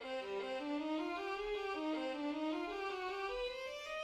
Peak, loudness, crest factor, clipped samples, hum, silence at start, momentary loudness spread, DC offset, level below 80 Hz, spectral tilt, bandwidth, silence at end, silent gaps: -30 dBFS; -41 LUFS; 10 dB; under 0.1%; none; 0 s; 3 LU; under 0.1%; -66 dBFS; -3.5 dB/octave; 13 kHz; 0 s; none